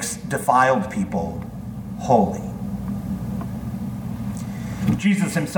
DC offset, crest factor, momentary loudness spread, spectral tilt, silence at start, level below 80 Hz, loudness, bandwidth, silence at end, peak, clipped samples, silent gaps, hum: under 0.1%; 20 dB; 12 LU; -6 dB/octave; 0 s; -42 dBFS; -23 LUFS; 19 kHz; 0 s; -2 dBFS; under 0.1%; none; none